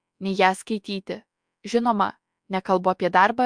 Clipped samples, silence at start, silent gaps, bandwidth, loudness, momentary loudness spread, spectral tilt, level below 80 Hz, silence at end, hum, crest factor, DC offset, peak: under 0.1%; 0.2 s; none; 10.5 kHz; -23 LUFS; 13 LU; -5 dB/octave; -66 dBFS; 0 s; none; 20 dB; under 0.1%; -4 dBFS